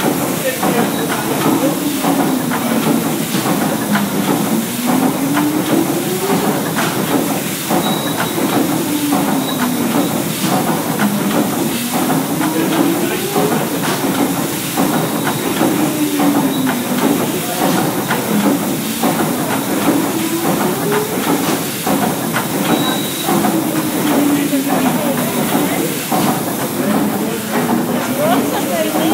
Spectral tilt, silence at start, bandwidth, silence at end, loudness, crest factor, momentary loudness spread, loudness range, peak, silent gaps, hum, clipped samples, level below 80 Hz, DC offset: -4.5 dB/octave; 0 s; 16 kHz; 0 s; -16 LUFS; 14 dB; 2 LU; 1 LU; -2 dBFS; none; none; under 0.1%; -54 dBFS; under 0.1%